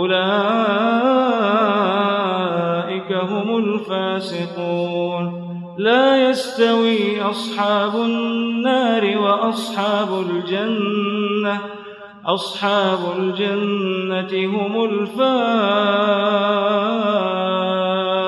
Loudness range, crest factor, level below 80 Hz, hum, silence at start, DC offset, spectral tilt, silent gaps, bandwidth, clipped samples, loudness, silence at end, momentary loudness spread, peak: 3 LU; 16 dB; -70 dBFS; none; 0 s; under 0.1%; -6 dB/octave; none; 12.5 kHz; under 0.1%; -19 LUFS; 0 s; 6 LU; -4 dBFS